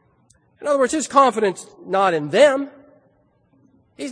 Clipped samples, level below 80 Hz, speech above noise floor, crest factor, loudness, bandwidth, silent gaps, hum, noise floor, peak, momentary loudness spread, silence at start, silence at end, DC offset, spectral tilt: under 0.1%; -66 dBFS; 42 dB; 20 dB; -18 LUFS; 10.5 kHz; none; none; -60 dBFS; 0 dBFS; 17 LU; 0.6 s; 0 s; under 0.1%; -4 dB/octave